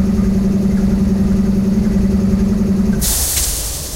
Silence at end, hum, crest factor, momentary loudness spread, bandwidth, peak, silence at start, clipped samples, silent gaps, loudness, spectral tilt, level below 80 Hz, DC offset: 0 s; none; 10 dB; 1 LU; 16 kHz; -4 dBFS; 0 s; under 0.1%; none; -15 LUFS; -5 dB/octave; -22 dBFS; under 0.1%